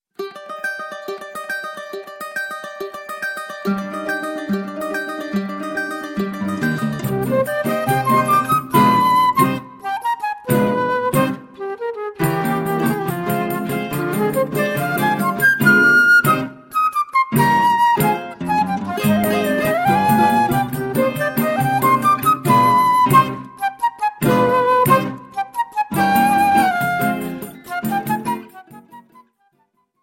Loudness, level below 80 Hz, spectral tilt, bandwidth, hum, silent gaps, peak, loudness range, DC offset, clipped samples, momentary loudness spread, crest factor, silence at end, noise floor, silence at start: -18 LUFS; -52 dBFS; -5.5 dB/octave; 16.5 kHz; none; none; 0 dBFS; 10 LU; under 0.1%; under 0.1%; 13 LU; 18 dB; 1 s; -64 dBFS; 0.2 s